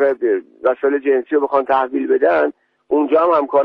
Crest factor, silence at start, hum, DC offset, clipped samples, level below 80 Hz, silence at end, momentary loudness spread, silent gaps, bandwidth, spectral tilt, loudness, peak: 12 dB; 0 s; none; under 0.1%; under 0.1%; -62 dBFS; 0 s; 5 LU; none; 4.9 kHz; -7.5 dB/octave; -17 LUFS; -4 dBFS